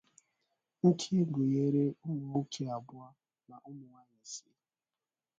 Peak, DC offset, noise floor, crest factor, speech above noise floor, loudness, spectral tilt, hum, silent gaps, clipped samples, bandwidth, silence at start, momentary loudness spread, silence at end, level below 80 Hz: -14 dBFS; under 0.1%; under -90 dBFS; 20 dB; over 57 dB; -32 LUFS; -7 dB/octave; none; none; under 0.1%; 9.2 kHz; 0.85 s; 22 LU; 1 s; -76 dBFS